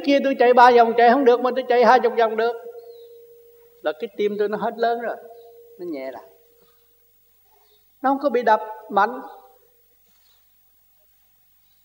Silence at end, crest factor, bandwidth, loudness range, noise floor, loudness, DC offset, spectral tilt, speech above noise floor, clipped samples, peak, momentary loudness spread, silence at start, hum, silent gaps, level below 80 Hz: 2.5 s; 20 dB; 16.5 kHz; 13 LU; -59 dBFS; -19 LUFS; under 0.1%; -5 dB/octave; 41 dB; under 0.1%; -2 dBFS; 21 LU; 0 s; none; none; -74 dBFS